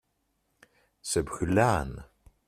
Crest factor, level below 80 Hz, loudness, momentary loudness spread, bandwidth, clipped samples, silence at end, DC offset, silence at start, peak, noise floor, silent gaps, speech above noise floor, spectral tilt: 22 dB; -48 dBFS; -27 LUFS; 17 LU; 15 kHz; under 0.1%; 0.45 s; under 0.1%; 1.05 s; -8 dBFS; -76 dBFS; none; 49 dB; -5 dB/octave